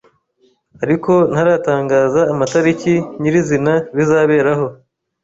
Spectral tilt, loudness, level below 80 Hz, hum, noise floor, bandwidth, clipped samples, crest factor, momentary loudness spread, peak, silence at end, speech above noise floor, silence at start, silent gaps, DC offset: -7 dB/octave; -15 LUFS; -52 dBFS; none; -58 dBFS; 8 kHz; under 0.1%; 12 dB; 5 LU; -2 dBFS; 0.5 s; 44 dB; 0.8 s; none; under 0.1%